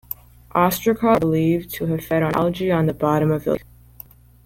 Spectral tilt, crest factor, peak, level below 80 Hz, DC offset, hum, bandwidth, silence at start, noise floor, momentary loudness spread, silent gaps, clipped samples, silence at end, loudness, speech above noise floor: -7 dB/octave; 18 dB; -4 dBFS; -46 dBFS; under 0.1%; none; 17 kHz; 0.55 s; -45 dBFS; 8 LU; none; under 0.1%; 0.85 s; -20 LUFS; 26 dB